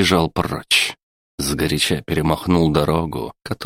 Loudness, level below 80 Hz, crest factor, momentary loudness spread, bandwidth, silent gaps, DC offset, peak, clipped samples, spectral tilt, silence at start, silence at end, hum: -19 LUFS; -38 dBFS; 18 dB; 9 LU; 16.5 kHz; 1.03-1.38 s; under 0.1%; 0 dBFS; under 0.1%; -4.5 dB/octave; 0 s; 0 s; none